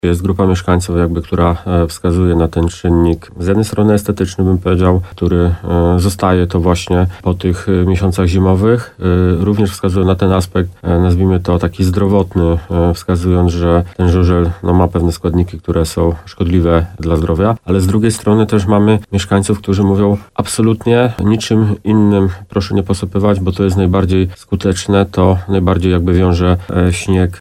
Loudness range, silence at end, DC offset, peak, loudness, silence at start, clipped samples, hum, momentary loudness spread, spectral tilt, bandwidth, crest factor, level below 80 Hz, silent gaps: 1 LU; 0 s; under 0.1%; 0 dBFS; -13 LUFS; 0.05 s; under 0.1%; none; 4 LU; -7 dB/octave; 13.5 kHz; 12 dB; -28 dBFS; none